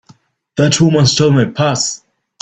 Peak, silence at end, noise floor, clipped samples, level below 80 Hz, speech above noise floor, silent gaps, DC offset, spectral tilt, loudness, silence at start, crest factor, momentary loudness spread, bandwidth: 0 dBFS; 0.45 s; -48 dBFS; under 0.1%; -48 dBFS; 37 dB; none; under 0.1%; -5 dB/octave; -12 LUFS; 0.55 s; 14 dB; 10 LU; 9.2 kHz